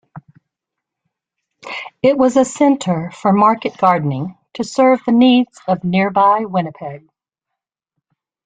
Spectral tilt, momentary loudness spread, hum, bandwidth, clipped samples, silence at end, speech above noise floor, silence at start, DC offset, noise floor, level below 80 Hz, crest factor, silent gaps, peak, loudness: -6 dB/octave; 15 LU; none; 9.4 kHz; under 0.1%; 1.5 s; 67 dB; 0.15 s; under 0.1%; -82 dBFS; -58 dBFS; 16 dB; none; -2 dBFS; -15 LUFS